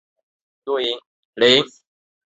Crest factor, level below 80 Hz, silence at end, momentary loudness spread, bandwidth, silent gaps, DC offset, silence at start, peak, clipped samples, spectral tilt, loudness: 22 dB; -62 dBFS; 0.6 s; 17 LU; 8 kHz; 1.06-1.33 s; under 0.1%; 0.65 s; -2 dBFS; under 0.1%; -3.5 dB/octave; -18 LUFS